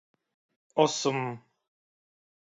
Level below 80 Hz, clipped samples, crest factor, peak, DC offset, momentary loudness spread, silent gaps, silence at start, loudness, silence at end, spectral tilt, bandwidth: -80 dBFS; under 0.1%; 24 dB; -8 dBFS; under 0.1%; 13 LU; none; 0.75 s; -28 LUFS; 1.15 s; -4 dB/octave; 8 kHz